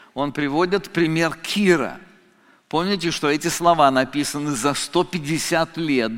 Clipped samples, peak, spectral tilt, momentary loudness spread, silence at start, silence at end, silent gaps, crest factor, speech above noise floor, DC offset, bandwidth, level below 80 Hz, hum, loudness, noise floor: under 0.1%; -2 dBFS; -4.5 dB/octave; 7 LU; 0.15 s; 0 s; none; 18 dB; 35 dB; under 0.1%; 17 kHz; -52 dBFS; none; -21 LUFS; -56 dBFS